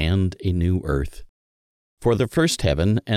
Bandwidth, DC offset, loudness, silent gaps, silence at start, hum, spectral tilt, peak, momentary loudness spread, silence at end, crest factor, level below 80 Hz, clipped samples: 14.5 kHz; under 0.1%; -22 LUFS; 1.29-1.97 s; 0 s; none; -6 dB/octave; -6 dBFS; 6 LU; 0 s; 16 dB; -34 dBFS; under 0.1%